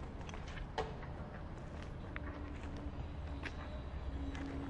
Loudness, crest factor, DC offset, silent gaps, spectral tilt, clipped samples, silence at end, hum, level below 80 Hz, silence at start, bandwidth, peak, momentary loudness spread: -46 LUFS; 20 dB; under 0.1%; none; -6.5 dB/octave; under 0.1%; 0 s; none; -48 dBFS; 0 s; 10.5 kHz; -26 dBFS; 5 LU